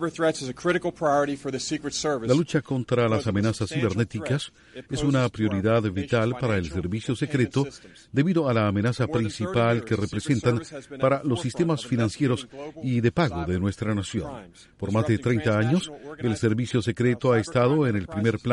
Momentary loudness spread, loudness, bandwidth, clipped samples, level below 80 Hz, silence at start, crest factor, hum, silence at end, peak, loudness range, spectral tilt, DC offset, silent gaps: 7 LU; -25 LUFS; 11.5 kHz; under 0.1%; -52 dBFS; 0 s; 16 dB; none; 0 s; -8 dBFS; 2 LU; -6.5 dB/octave; under 0.1%; none